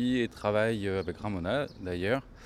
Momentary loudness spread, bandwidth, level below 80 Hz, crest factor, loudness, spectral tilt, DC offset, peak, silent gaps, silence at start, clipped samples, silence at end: 6 LU; 13.5 kHz; -54 dBFS; 16 dB; -31 LUFS; -6.5 dB/octave; under 0.1%; -14 dBFS; none; 0 s; under 0.1%; 0 s